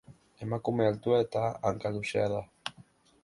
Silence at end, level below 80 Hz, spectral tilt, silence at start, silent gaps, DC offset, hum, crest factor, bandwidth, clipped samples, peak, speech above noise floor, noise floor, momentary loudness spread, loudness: 0.4 s; -62 dBFS; -6.5 dB/octave; 0.1 s; none; under 0.1%; none; 18 dB; 11.5 kHz; under 0.1%; -14 dBFS; 29 dB; -59 dBFS; 14 LU; -31 LUFS